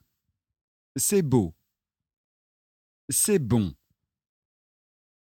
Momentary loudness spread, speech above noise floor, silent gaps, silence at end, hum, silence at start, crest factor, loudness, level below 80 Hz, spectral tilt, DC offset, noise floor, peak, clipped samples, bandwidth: 11 LU; 61 dB; 2.17-3.08 s; 1.55 s; none; 0.95 s; 20 dB; -24 LUFS; -56 dBFS; -5 dB/octave; under 0.1%; -85 dBFS; -8 dBFS; under 0.1%; 17.5 kHz